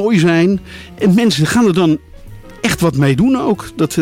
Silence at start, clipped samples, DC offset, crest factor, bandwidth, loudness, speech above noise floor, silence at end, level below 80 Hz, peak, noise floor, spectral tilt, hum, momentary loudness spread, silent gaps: 0 s; under 0.1%; under 0.1%; 10 dB; 16.5 kHz; -14 LUFS; 21 dB; 0 s; -40 dBFS; -4 dBFS; -34 dBFS; -6 dB/octave; none; 8 LU; none